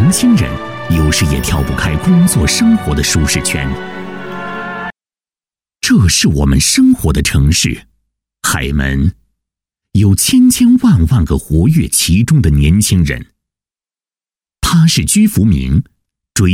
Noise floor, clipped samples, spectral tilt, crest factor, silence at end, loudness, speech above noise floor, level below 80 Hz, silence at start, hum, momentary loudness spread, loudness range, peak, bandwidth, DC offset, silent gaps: under -90 dBFS; under 0.1%; -4.5 dB/octave; 12 dB; 0 s; -11 LUFS; over 80 dB; -22 dBFS; 0 s; none; 13 LU; 5 LU; 0 dBFS; 17 kHz; under 0.1%; none